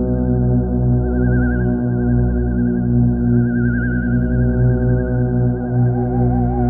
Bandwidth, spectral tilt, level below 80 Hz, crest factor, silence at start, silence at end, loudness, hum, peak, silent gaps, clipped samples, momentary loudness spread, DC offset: 1.8 kHz; -13 dB/octave; -24 dBFS; 12 dB; 0 s; 0 s; -17 LUFS; 60 Hz at -25 dBFS; -4 dBFS; none; under 0.1%; 2 LU; under 0.1%